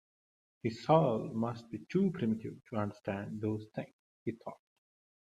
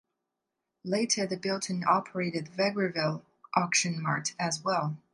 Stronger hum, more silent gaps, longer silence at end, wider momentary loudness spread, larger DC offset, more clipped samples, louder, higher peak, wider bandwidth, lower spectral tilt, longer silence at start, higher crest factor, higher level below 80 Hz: neither; first, 3.93-4.26 s vs none; first, 0.7 s vs 0.15 s; first, 16 LU vs 6 LU; neither; neither; second, -35 LUFS vs -29 LUFS; about the same, -12 dBFS vs -10 dBFS; second, 9.4 kHz vs 11.5 kHz; first, -8.5 dB/octave vs -3.5 dB/octave; second, 0.65 s vs 0.85 s; about the same, 24 dB vs 22 dB; about the same, -72 dBFS vs -76 dBFS